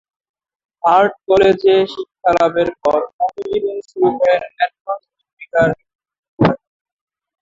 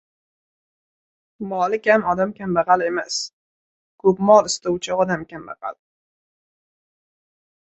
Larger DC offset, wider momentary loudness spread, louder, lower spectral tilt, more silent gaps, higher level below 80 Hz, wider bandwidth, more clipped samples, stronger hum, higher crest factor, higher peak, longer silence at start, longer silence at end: neither; second, 10 LU vs 18 LU; first, -16 LUFS vs -19 LUFS; first, -7 dB/octave vs -4.5 dB/octave; second, 3.13-3.19 s, 4.81-4.85 s, 5.33-5.37 s, 5.95-5.99 s, 6.19-6.23 s, 6.29-6.37 s vs 3.33-3.98 s; first, -48 dBFS vs -60 dBFS; second, 7.6 kHz vs 8.4 kHz; neither; neither; about the same, 16 dB vs 20 dB; about the same, 0 dBFS vs -2 dBFS; second, 0.85 s vs 1.4 s; second, 0.85 s vs 2 s